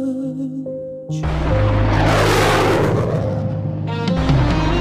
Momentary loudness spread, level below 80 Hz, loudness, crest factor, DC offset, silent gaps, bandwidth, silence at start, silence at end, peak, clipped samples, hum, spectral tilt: 11 LU; -26 dBFS; -18 LUFS; 14 dB; under 0.1%; none; 15.5 kHz; 0 s; 0 s; -4 dBFS; under 0.1%; none; -6.5 dB/octave